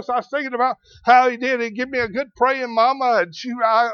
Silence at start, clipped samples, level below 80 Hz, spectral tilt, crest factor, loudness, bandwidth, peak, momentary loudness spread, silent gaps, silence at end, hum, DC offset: 0 s; under 0.1%; -58 dBFS; -4 dB/octave; 18 dB; -19 LUFS; 6.8 kHz; -2 dBFS; 9 LU; none; 0 s; none; under 0.1%